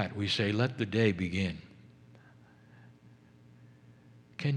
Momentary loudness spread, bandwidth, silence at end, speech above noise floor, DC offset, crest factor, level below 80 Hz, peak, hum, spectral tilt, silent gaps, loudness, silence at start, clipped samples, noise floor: 11 LU; 10.5 kHz; 0 s; 28 dB; under 0.1%; 22 dB; -64 dBFS; -12 dBFS; none; -6 dB/octave; none; -31 LUFS; 0 s; under 0.1%; -58 dBFS